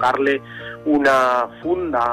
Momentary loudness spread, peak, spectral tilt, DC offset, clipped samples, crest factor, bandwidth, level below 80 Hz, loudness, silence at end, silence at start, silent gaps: 10 LU; -8 dBFS; -5 dB/octave; under 0.1%; under 0.1%; 12 dB; 15.5 kHz; -52 dBFS; -19 LUFS; 0 s; 0 s; none